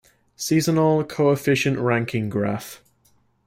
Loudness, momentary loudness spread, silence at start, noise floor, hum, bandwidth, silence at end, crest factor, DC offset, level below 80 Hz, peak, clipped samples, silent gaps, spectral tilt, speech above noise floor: -21 LUFS; 10 LU; 0.4 s; -62 dBFS; none; 16 kHz; 0.7 s; 14 dB; under 0.1%; -58 dBFS; -8 dBFS; under 0.1%; none; -5.5 dB/octave; 41 dB